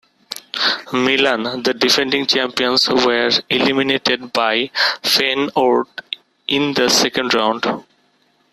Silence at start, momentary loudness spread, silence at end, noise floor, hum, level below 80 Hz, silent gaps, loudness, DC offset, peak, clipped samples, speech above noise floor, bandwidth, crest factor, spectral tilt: 0.3 s; 10 LU; 0.7 s; -59 dBFS; none; -58 dBFS; none; -16 LUFS; under 0.1%; -2 dBFS; under 0.1%; 43 dB; 14 kHz; 16 dB; -2.5 dB/octave